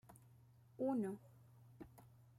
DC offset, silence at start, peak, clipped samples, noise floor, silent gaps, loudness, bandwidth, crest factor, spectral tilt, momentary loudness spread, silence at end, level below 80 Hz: under 0.1%; 0.1 s; -30 dBFS; under 0.1%; -67 dBFS; none; -44 LUFS; 15 kHz; 18 dB; -8.5 dB/octave; 25 LU; 0.35 s; -80 dBFS